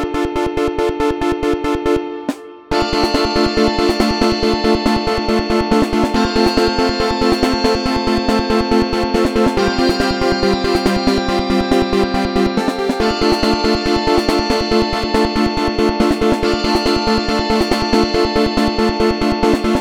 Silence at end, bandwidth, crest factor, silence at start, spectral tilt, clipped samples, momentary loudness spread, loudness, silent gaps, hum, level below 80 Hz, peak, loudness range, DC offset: 0 s; 17.5 kHz; 16 dB; 0 s; -5 dB/octave; under 0.1%; 3 LU; -16 LUFS; none; none; -28 dBFS; 0 dBFS; 1 LU; under 0.1%